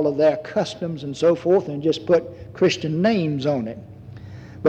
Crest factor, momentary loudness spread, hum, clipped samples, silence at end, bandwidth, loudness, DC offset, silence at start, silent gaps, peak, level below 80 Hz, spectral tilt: 14 dB; 20 LU; none; under 0.1%; 0 s; 9 kHz; -21 LUFS; under 0.1%; 0 s; none; -6 dBFS; -56 dBFS; -6.5 dB/octave